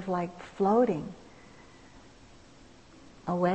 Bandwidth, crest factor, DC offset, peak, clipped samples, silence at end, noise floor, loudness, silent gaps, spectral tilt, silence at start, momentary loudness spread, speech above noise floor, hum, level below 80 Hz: 8.6 kHz; 18 dB; under 0.1%; -14 dBFS; under 0.1%; 0 s; -55 dBFS; -29 LUFS; none; -8 dB/octave; 0 s; 22 LU; 27 dB; none; -60 dBFS